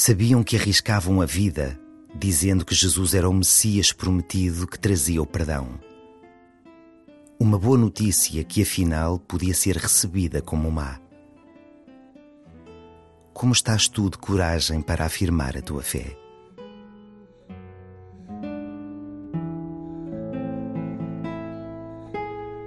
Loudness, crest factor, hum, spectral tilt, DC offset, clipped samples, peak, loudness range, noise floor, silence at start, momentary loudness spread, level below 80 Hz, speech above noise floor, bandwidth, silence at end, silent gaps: -22 LUFS; 20 dB; none; -4 dB/octave; under 0.1%; under 0.1%; -4 dBFS; 14 LU; -51 dBFS; 0 s; 18 LU; -38 dBFS; 30 dB; 12.5 kHz; 0 s; none